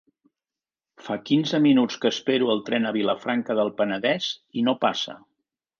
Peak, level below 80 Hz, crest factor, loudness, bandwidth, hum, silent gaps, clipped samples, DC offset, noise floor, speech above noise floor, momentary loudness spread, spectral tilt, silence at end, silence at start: -8 dBFS; -72 dBFS; 16 dB; -24 LUFS; 7.2 kHz; none; none; under 0.1%; under 0.1%; under -90 dBFS; over 67 dB; 10 LU; -5 dB/octave; 0.6 s; 1 s